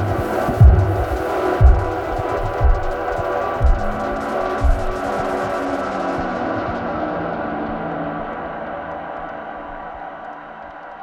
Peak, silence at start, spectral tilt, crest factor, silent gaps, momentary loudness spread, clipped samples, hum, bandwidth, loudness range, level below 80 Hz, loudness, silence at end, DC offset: 0 dBFS; 0 s; -8 dB/octave; 18 dB; none; 16 LU; under 0.1%; none; 14 kHz; 9 LU; -22 dBFS; -20 LUFS; 0 s; under 0.1%